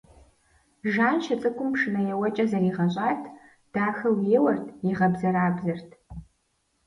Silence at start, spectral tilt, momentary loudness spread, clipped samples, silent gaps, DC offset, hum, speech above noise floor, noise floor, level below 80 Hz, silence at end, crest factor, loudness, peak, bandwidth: 0.85 s; -8 dB/octave; 13 LU; under 0.1%; none; under 0.1%; none; 47 dB; -72 dBFS; -58 dBFS; 0.65 s; 18 dB; -25 LUFS; -8 dBFS; 10.5 kHz